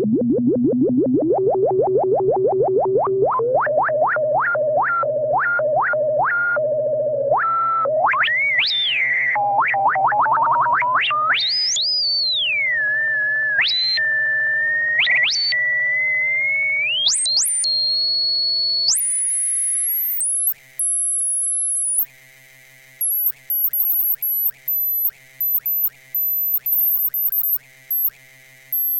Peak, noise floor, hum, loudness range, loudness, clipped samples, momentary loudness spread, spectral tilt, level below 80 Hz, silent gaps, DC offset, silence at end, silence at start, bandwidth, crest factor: -6 dBFS; -47 dBFS; none; 3 LU; -17 LUFS; under 0.1%; 4 LU; -1.5 dB/octave; -62 dBFS; none; under 0.1%; 0 s; 0 s; 17 kHz; 12 dB